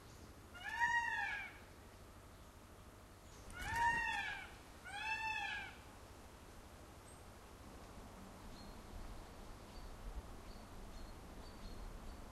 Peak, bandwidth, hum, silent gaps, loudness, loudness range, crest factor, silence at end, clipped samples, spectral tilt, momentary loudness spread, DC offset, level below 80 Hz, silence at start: -24 dBFS; 14 kHz; none; none; -43 LUFS; 14 LU; 22 dB; 0 s; under 0.1%; -3 dB/octave; 22 LU; under 0.1%; -58 dBFS; 0 s